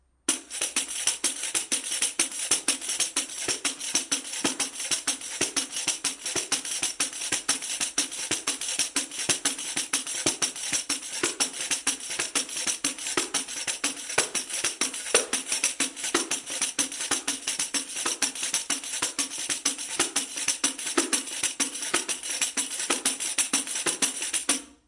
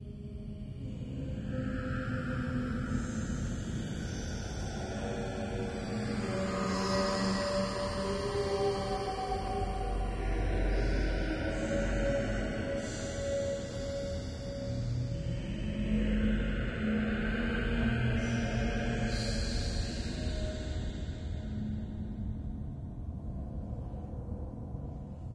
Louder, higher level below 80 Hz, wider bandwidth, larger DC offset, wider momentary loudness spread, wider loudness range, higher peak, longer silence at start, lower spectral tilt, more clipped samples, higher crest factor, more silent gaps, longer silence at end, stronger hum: first, -26 LUFS vs -35 LUFS; second, -68 dBFS vs -40 dBFS; about the same, 12 kHz vs 11 kHz; neither; second, 4 LU vs 10 LU; second, 1 LU vs 6 LU; first, -2 dBFS vs -18 dBFS; first, 0.3 s vs 0 s; second, 0.5 dB/octave vs -6 dB/octave; neither; first, 26 dB vs 16 dB; neither; first, 0.15 s vs 0 s; neither